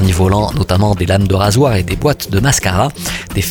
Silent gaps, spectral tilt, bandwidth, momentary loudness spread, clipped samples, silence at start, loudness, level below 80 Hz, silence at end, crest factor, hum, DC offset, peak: none; -5 dB/octave; 19 kHz; 5 LU; under 0.1%; 0 s; -13 LUFS; -28 dBFS; 0 s; 12 dB; none; under 0.1%; 0 dBFS